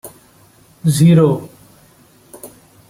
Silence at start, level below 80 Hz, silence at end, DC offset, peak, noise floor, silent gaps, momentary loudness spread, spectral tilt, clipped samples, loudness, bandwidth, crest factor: 0.05 s; -52 dBFS; 0.4 s; under 0.1%; -2 dBFS; -49 dBFS; none; 27 LU; -7 dB/octave; under 0.1%; -13 LUFS; 15.5 kHz; 16 dB